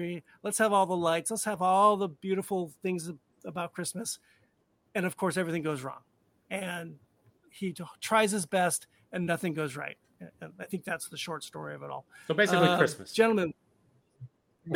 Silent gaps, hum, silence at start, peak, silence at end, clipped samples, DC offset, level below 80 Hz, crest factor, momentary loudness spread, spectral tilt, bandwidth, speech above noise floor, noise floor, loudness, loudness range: none; none; 0 s; -8 dBFS; 0 s; under 0.1%; under 0.1%; -74 dBFS; 22 dB; 17 LU; -4 dB/octave; 18 kHz; 42 dB; -72 dBFS; -30 LUFS; 7 LU